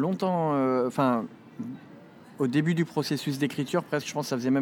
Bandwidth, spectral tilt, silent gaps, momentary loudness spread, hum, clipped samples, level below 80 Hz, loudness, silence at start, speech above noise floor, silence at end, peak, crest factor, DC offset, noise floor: 18 kHz; -6 dB/octave; none; 14 LU; none; under 0.1%; -80 dBFS; -27 LUFS; 0 s; 23 dB; 0 s; -10 dBFS; 16 dB; under 0.1%; -49 dBFS